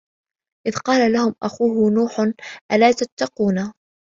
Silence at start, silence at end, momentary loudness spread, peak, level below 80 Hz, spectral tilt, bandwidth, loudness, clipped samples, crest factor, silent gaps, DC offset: 0.65 s; 0.45 s; 10 LU; -2 dBFS; -60 dBFS; -5.5 dB/octave; 7.6 kHz; -19 LUFS; under 0.1%; 18 dB; 2.61-2.69 s, 3.12-3.17 s; under 0.1%